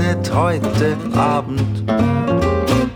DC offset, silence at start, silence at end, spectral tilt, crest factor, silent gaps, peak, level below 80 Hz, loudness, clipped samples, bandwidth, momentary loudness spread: under 0.1%; 0 s; 0 s; -7 dB/octave; 14 dB; none; -2 dBFS; -34 dBFS; -17 LUFS; under 0.1%; 16.5 kHz; 2 LU